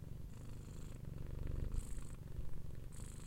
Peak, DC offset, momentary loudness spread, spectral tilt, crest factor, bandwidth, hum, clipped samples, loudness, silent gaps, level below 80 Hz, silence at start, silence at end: -26 dBFS; under 0.1%; 7 LU; -6.5 dB/octave; 18 dB; 16.5 kHz; none; under 0.1%; -50 LUFS; none; -48 dBFS; 0 s; 0 s